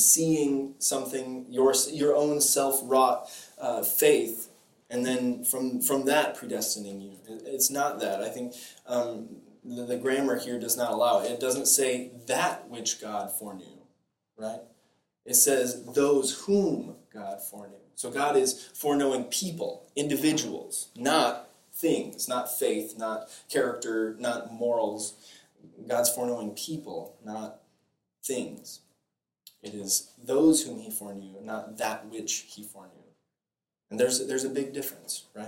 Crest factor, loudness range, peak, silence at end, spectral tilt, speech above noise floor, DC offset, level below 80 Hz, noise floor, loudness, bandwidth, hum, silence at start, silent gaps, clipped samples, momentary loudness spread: 24 dB; 8 LU; -6 dBFS; 0 s; -2.5 dB/octave; over 62 dB; under 0.1%; -72 dBFS; under -90 dBFS; -27 LUFS; 17 kHz; none; 0 s; none; under 0.1%; 17 LU